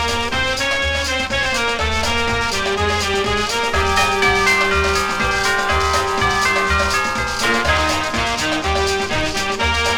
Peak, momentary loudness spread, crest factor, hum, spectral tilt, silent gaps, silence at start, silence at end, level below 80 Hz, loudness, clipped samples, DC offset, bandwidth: -4 dBFS; 4 LU; 14 dB; none; -3 dB/octave; none; 0 s; 0 s; -30 dBFS; -17 LUFS; under 0.1%; under 0.1%; 19 kHz